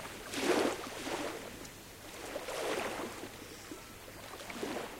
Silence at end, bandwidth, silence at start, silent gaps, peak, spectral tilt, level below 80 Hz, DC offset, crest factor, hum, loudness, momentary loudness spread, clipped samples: 0 s; 16 kHz; 0 s; none; -18 dBFS; -3 dB/octave; -62 dBFS; under 0.1%; 22 dB; none; -39 LUFS; 15 LU; under 0.1%